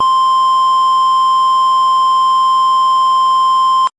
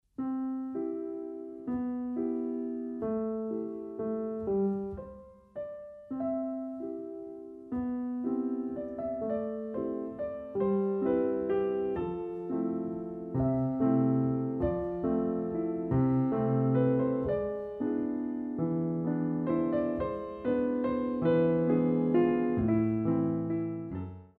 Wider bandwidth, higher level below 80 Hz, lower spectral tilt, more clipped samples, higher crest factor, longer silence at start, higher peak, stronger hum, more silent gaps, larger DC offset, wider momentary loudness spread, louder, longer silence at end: first, 10 kHz vs 4 kHz; about the same, -56 dBFS vs -56 dBFS; second, -0.5 dB/octave vs -12 dB/octave; neither; second, 6 dB vs 16 dB; second, 0 s vs 0.2 s; first, -6 dBFS vs -16 dBFS; neither; neither; neither; second, 0 LU vs 12 LU; first, -11 LUFS vs -31 LUFS; about the same, 0.1 s vs 0.1 s